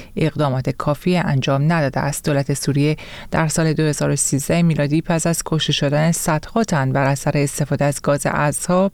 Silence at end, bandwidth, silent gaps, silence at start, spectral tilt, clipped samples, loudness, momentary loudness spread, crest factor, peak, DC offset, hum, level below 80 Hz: 0.05 s; 17 kHz; none; 0 s; -5 dB/octave; under 0.1%; -19 LUFS; 3 LU; 14 dB; -4 dBFS; 0.2%; none; -42 dBFS